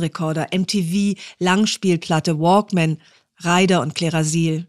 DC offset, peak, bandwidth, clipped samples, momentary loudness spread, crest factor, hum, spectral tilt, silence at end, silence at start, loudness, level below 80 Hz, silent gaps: 0.1%; -4 dBFS; 13.5 kHz; under 0.1%; 7 LU; 16 dB; none; -5 dB/octave; 0.05 s; 0 s; -19 LUFS; -62 dBFS; none